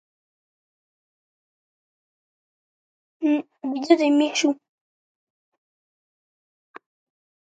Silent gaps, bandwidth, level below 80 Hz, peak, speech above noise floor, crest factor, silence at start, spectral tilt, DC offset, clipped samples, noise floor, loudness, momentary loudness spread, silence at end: none; 9.2 kHz; -86 dBFS; -4 dBFS; over 69 dB; 24 dB; 3.2 s; -2 dB/octave; under 0.1%; under 0.1%; under -90 dBFS; -22 LUFS; 12 LU; 2.85 s